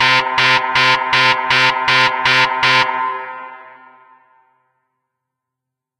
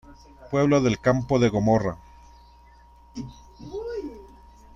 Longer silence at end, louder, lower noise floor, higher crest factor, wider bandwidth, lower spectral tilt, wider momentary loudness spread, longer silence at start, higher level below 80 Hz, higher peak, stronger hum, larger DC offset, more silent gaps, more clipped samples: first, 2.3 s vs 0.5 s; first, -12 LUFS vs -23 LUFS; first, -82 dBFS vs -52 dBFS; about the same, 16 dB vs 18 dB; first, 14.5 kHz vs 7.6 kHz; second, -2 dB/octave vs -7 dB/octave; second, 13 LU vs 21 LU; about the same, 0 s vs 0.1 s; second, -56 dBFS vs -48 dBFS; first, 0 dBFS vs -8 dBFS; second, none vs 60 Hz at -50 dBFS; neither; neither; neither